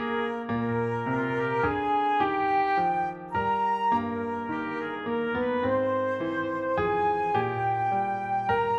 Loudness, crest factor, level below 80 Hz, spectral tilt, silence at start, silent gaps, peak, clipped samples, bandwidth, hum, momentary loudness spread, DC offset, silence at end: -27 LUFS; 14 dB; -56 dBFS; -7.5 dB/octave; 0 s; none; -12 dBFS; under 0.1%; 8 kHz; none; 6 LU; under 0.1%; 0 s